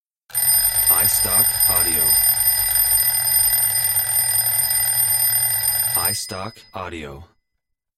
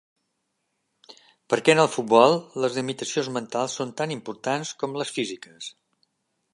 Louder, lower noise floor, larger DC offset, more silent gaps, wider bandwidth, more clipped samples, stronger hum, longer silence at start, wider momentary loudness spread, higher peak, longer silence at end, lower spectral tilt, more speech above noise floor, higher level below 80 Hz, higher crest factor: first, -15 LUFS vs -24 LUFS; about the same, -76 dBFS vs -76 dBFS; neither; neither; first, 16.5 kHz vs 11.5 kHz; neither; neither; second, 0.35 s vs 1.1 s; about the same, 16 LU vs 14 LU; about the same, -4 dBFS vs -2 dBFS; about the same, 0.75 s vs 0.85 s; second, 0 dB/octave vs -4 dB/octave; first, 57 dB vs 53 dB; first, -44 dBFS vs -76 dBFS; second, 14 dB vs 24 dB